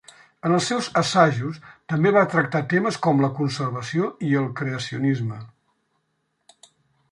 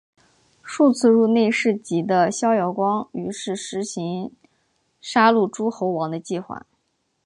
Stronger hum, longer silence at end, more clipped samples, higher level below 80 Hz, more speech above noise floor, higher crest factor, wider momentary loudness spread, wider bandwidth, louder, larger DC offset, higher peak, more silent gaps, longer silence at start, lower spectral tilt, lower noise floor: neither; first, 1.65 s vs 0.65 s; neither; about the same, -64 dBFS vs -68 dBFS; about the same, 51 dB vs 51 dB; about the same, 20 dB vs 18 dB; second, 11 LU vs 14 LU; about the same, 11.5 kHz vs 11 kHz; about the same, -22 LUFS vs -21 LUFS; neither; about the same, -4 dBFS vs -4 dBFS; neither; second, 0.45 s vs 0.65 s; about the same, -6 dB/octave vs -5 dB/octave; about the same, -73 dBFS vs -71 dBFS